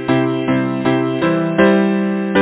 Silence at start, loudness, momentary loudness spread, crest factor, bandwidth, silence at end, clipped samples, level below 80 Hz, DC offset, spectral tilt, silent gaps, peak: 0 s; -16 LUFS; 5 LU; 14 dB; 4 kHz; 0 s; under 0.1%; -48 dBFS; under 0.1%; -11 dB/octave; none; 0 dBFS